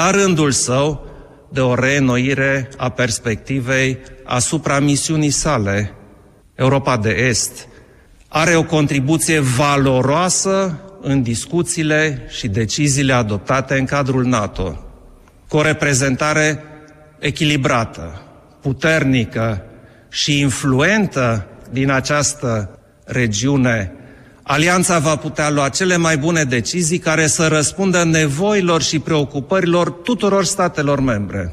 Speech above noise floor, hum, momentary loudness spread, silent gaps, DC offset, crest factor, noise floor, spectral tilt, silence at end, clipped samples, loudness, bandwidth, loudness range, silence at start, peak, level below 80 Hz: 30 dB; none; 9 LU; none; under 0.1%; 14 dB; -46 dBFS; -4.5 dB/octave; 0 s; under 0.1%; -16 LUFS; 14.5 kHz; 3 LU; 0 s; -2 dBFS; -40 dBFS